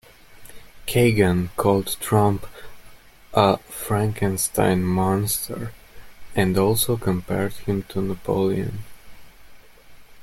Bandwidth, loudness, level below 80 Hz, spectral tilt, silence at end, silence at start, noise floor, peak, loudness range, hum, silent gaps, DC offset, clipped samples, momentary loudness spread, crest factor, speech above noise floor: 16.5 kHz; -22 LUFS; -46 dBFS; -5.5 dB/octave; 0 s; 0.3 s; -45 dBFS; -2 dBFS; 3 LU; none; none; under 0.1%; under 0.1%; 11 LU; 20 dB; 24 dB